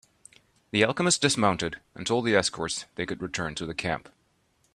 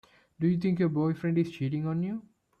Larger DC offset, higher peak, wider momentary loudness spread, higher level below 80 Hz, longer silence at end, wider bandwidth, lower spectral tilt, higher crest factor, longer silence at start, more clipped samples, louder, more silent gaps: neither; first, -6 dBFS vs -16 dBFS; first, 11 LU vs 6 LU; first, -58 dBFS vs -66 dBFS; first, 0.75 s vs 0.4 s; first, 13 kHz vs 6.8 kHz; second, -3.5 dB/octave vs -9.5 dB/octave; first, 22 dB vs 14 dB; first, 0.75 s vs 0.4 s; neither; about the same, -27 LUFS vs -29 LUFS; neither